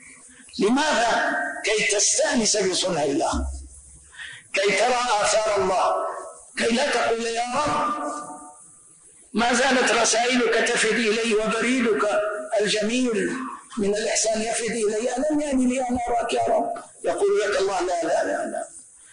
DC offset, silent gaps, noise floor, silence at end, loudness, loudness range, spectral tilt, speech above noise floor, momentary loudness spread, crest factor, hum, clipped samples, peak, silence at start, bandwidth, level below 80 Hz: under 0.1%; none; -51 dBFS; 0.3 s; -22 LUFS; 3 LU; -2.5 dB/octave; 29 dB; 12 LU; 12 dB; none; under 0.1%; -10 dBFS; 0.05 s; 10.5 kHz; -46 dBFS